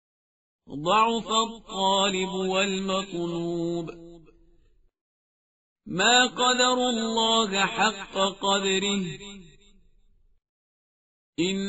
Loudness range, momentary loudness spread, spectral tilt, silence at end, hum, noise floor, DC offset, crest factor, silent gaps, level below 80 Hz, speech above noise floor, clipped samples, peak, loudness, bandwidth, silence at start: 8 LU; 13 LU; -1.5 dB/octave; 0 s; none; -61 dBFS; under 0.1%; 20 dB; 5.01-5.76 s, 10.49-11.33 s; -58 dBFS; 36 dB; under 0.1%; -6 dBFS; -24 LUFS; 8 kHz; 0.7 s